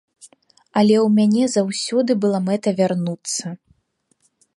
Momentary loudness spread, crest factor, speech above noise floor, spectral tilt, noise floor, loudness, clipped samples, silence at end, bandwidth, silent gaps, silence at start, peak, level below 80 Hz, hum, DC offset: 10 LU; 16 dB; 49 dB; -5.5 dB/octave; -67 dBFS; -19 LUFS; under 0.1%; 1 s; 11.5 kHz; none; 0.25 s; -4 dBFS; -68 dBFS; none; under 0.1%